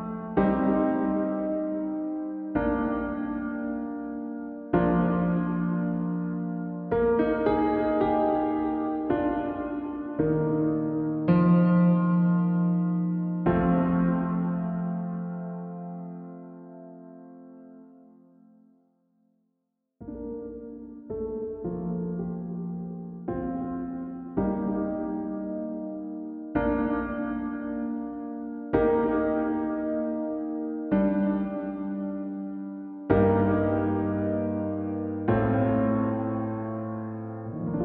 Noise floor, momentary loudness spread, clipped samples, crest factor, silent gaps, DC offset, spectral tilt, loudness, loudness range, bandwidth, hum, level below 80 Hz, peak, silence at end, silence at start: -79 dBFS; 13 LU; under 0.1%; 20 dB; none; under 0.1%; -12.5 dB/octave; -28 LUFS; 12 LU; 4.2 kHz; none; -50 dBFS; -8 dBFS; 0 s; 0 s